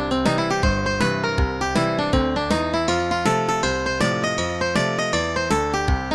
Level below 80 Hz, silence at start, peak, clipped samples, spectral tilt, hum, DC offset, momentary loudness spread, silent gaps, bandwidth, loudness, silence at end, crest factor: -32 dBFS; 0 s; -6 dBFS; under 0.1%; -5 dB/octave; none; under 0.1%; 2 LU; none; 13 kHz; -21 LUFS; 0 s; 16 dB